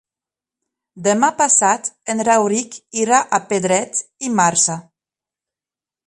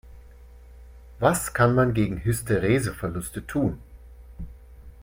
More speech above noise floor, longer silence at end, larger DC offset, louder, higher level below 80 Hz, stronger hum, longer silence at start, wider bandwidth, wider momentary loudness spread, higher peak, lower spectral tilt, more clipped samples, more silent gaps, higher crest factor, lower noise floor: first, over 73 dB vs 24 dB; first, 1.25 s vs 0.1 s; neither; first, -17 LUFS vs -24 LUFS; second, -66 dBFS vs -42 dBFS; neither; first, 0.95 s vs 0.05 s; second, 11.5 kHz vs 16.5 kHz; second, 10 LU vs 22 LU; first, -2 dBFS vs -6 dBFS; second, -3 dB/octave vs -6 dB/octave; neither; neither; about the same, 18 dB vs 20 dB; first, under -90 dBFS vs -47 dBFS